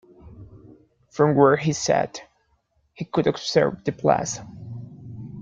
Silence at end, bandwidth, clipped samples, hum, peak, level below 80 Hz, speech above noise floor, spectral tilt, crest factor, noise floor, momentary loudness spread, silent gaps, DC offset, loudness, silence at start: 0 s; 9.4 kHz; under 0.1%; none; -4 dBFS; -56 dBFS; 46 dB; -5 dB/octave; 20 dB; -67 dBFS; 21 LU; none; under 0.1%; -22 LUFS; 0.25 s